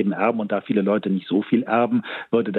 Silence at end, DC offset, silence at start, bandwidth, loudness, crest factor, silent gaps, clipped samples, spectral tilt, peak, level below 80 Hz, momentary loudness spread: 0 s; under 0.1%; 0 s; 4.3 kHz; -22 LUFS; 14 dB; none; under 0.1%; -9.5 dB/octave; -8 dBFS; -70 dBFS; 4 LU